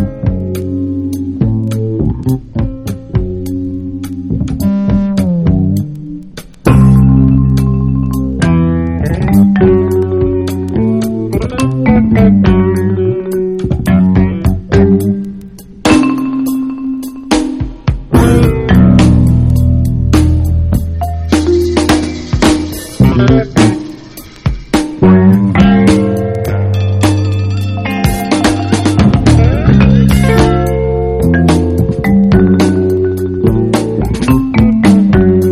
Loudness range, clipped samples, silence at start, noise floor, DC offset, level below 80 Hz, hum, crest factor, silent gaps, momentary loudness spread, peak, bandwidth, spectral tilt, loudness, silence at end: 5 LU; 0.6%; 0 s; -31 dBFS; 0.3%; -20 dBFS; none; 10 dB; none; 10 LU; 0 dBFS; 15 kHz; -7.5 dB/octave; -11 LUFS; 0 s